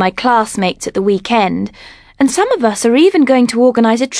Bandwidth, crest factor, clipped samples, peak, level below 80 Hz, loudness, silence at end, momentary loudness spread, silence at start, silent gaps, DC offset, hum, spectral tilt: 11 kHz; 12 dB; under 0.1%; 0 dBFS; -48 dBFS; -12 LUFS; 0 s; 7 LU; 0 s; none; under 0.1%; none; -4.5 dB/octave